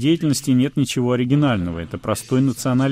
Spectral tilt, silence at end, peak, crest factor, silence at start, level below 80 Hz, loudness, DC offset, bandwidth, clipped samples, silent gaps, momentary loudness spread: -6 dB/octave; 0 s; -4 dBFS; 14 dB; 0 s; -48 dBFS; -20 LUFS; under 0.1%; 16 kHz; under 0.1%; none; 7 LU